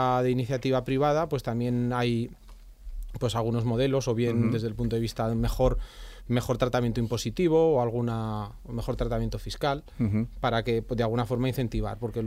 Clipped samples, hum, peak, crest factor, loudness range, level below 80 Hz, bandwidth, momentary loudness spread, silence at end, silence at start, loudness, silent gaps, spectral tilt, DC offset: under 0.1%; none; -10 dBFS; 16 dB; 2 LU; -40 dBFS; 15.5 kHz; 9 LU; 0 s; 0 s; -28 LUFS; none; -7 dB/octave; under 0.1%